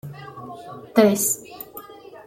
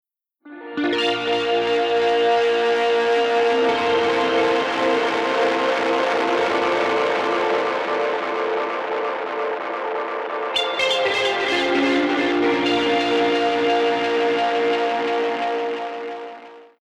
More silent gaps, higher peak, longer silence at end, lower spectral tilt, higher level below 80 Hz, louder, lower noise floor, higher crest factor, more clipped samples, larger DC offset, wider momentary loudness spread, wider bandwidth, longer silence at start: neither; first, -4 dBFS vs -10 dBFS; about the same, 0.1 s vs 0.2 s; about the same, -4 dB/octave vs -3.5 dB/octave; about the same, -66 dBFS vs -62 dBFS; about the same, -20 LUFS vs -20 LUFS; second, -41 dBFS vs -47 dBFS; first, 20 dB vs 12 dB; neither; neither; first, 21 LU vs 7 LU; first, 16.5 kHz vs 10.5 kHz; second, 0.05 s vs 0.45 s